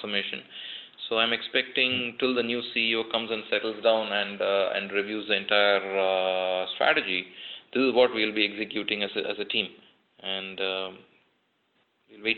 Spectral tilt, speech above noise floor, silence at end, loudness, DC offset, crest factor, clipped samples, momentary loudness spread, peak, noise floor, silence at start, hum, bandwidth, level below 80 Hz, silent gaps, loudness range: -6.5 dB/octave; 44 dB; 0 s; -26 LUFS; under 0.1%; 20 dB; under 0.1%; 11 LU; -8 dBFS; -71 dBFS; 0 s; none; 4.9 kHz; -72 dBFS; none; 5 LU